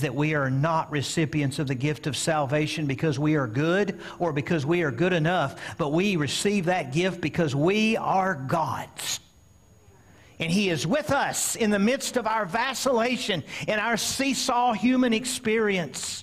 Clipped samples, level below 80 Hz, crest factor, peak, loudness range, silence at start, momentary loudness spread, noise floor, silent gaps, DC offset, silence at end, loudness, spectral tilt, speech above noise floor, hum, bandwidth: under 0.1%; -58 dBFS; 12 dB; -12 dBFS; 3 LU; 0 s; 5 LU; -56 dBFS; none; under 0.1%; 0 s; -25 LUFS; -4.5 dB/octave; 31 dB; none; 15.5 kHz